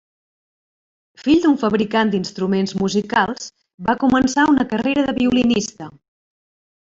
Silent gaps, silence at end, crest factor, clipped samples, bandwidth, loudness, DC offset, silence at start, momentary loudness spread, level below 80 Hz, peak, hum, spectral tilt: 3.74-3.78 s; 0.95 s; 16 dB; under 0.1%; 7.8 kHz; -18 LUFS; under 0.1%; 1.2 s; 11 LU; -50 dBFS; -4 dBFS; none; -5 dB/octave